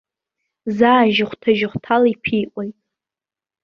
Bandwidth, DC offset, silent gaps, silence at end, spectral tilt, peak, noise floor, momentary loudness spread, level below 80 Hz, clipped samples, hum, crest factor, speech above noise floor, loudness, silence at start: 6.6 kHz; under 0.1%; none; 0.9 s; -7 dB/octave; -2 dBFS; under -90 dBFS; 16 LU; -58 dBFS; under 0.1%; none; 18 dB; over 73 dB; -17 LUFS; 0.65 s